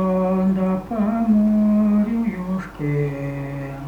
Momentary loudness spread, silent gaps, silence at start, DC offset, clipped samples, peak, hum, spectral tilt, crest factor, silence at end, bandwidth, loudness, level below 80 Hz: 10 LU; none; 0 s; under 0.1%; under 0.1%; -8 dBFS; none; -10 dB/octave; 12 dB; 0 s; 4.9 kHz; -20 LUFS; -44 dBFS